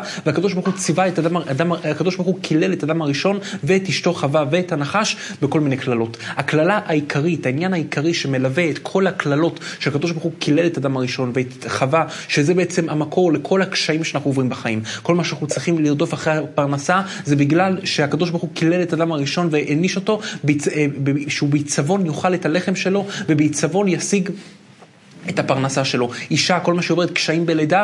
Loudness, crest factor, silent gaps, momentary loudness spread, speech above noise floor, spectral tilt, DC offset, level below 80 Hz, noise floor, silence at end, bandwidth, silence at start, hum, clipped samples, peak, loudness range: -19 LUFS; 16 dB; none; 5 LU; 27 dB; -5 dB/octave; under 0.1%; -66 dBFS; -46 dBFS; 0 s; 11.5 kHz; 0 s; none; under 0.1%; -2 dBFS; 1 LU